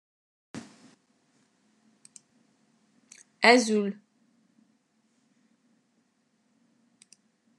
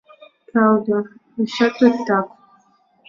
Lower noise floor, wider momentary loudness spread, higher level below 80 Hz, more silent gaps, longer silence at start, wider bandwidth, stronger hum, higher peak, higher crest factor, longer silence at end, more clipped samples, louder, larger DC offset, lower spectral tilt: first, -72 dBFS vs -58 dBFS; first, 26 LU vs 10 LU; second, under -90 dBFS vs -66 dBFS; neither; about the same, 0.55 s vs 0.55 s; first, 12 kHz vs 7.2 kHz; neither; about the same, -2 dBFS vs -2 dBFS; first, 30 dB vs 18 dB; first, 3.65 s vs 0.8 s; neither; second, -23 LUFS vs -18 LUFS; neither; second, -3.5 dB/octave vs -6.5 dB/octave